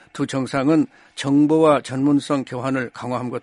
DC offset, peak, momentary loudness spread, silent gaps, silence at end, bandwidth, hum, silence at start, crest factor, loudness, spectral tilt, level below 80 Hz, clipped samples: under 0.1%; -2 dBFS; 11 LU; none; 0.05 s; 11.5 kHz; none; 0.15 s; 18 dB; -20 LUFS; -6.5 dB/octave; -60 dBFS; under 0.1%